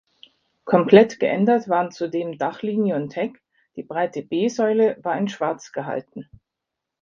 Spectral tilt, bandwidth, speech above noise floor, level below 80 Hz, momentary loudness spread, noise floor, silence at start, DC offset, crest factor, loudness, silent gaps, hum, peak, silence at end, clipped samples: -6.5 dB/octave; 7.4 kHz; 63 dB; -66 dBFS; 16 LU; -84 dBFS; 0.65 s; under 0.1%; 22 dB; -21 LUFS; none; none; 0 dBFS; 0.8 s; under 0.1%